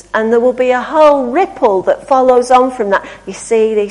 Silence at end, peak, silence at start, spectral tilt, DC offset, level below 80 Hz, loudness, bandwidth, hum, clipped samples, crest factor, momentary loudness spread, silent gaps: 0 s; 0 dBFS; 0.15 s; -4.5 dB/octave; under 0.1%; -48 dBFS; -11 LUFS; 11 kHz; none; under 0.1%; 12 dB; 7 LU; none